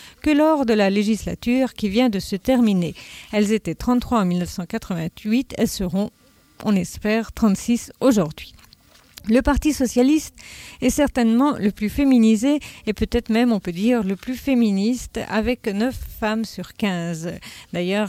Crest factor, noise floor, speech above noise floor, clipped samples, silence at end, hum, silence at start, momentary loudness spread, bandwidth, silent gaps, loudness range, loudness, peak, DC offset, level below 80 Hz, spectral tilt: 16 dB; -52 dBFS; 32 dB; under 0.1%; 0 s; none; 0 s; 10 LU; 16 kHz; none; 4 LU; -21 LUFS; -4 dBFS; under 0.1%; -40 dBFS; -5.5 dB/octave